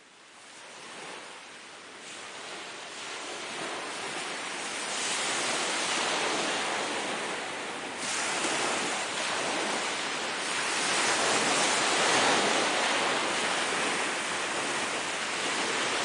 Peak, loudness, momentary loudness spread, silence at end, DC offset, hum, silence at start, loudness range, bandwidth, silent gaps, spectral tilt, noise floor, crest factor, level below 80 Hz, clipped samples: -12 dBFS; -28 LUFS; 17 LU; 0 s; under 0.1%; none; 0 s; 12 LU; 10.5 kHz; none; -0.5 dB/octave; -52 dBFS; 18 dB; -76 dBFS; under 0.1%